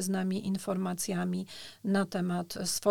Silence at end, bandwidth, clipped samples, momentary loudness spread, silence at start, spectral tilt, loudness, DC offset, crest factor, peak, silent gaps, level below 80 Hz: 0 s; 17.5 kHz; under 0.1%; 6 LU; 0 s; -5 dB/octave; -32 LUFS; 0.1%; 18 dB; -14 dBFS; none; -66 dBFS